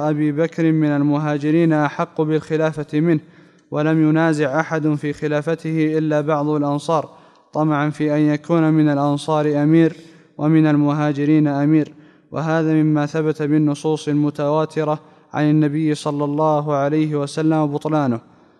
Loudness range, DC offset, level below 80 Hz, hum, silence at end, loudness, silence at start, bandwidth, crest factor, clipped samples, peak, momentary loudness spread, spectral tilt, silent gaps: 2 LU; under 0.1%; -66 dBFS; none; 0.4 s; -18 LUFS; 0 s; 10 kHz; 14 dB; under 0.1%; -4 dBFS; 6 LU; -8 dB/octave; none